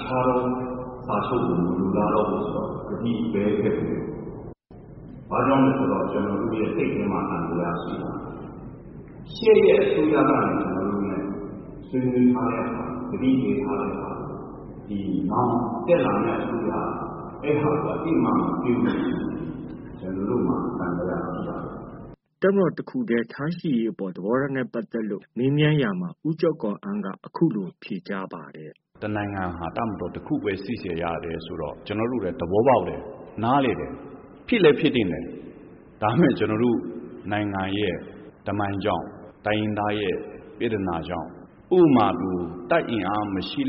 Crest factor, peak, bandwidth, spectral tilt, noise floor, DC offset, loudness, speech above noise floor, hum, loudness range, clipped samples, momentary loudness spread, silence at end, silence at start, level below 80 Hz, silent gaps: 20 dB; -6 dBFS; 5.4 kHz; -6 dB/octave; -46 dBFS; under 0.1%; -24 LUFS; 23 dB; none; 6 LU; under 0.1%; 16 LU; 0 s; 0 s; -50 dBFS; none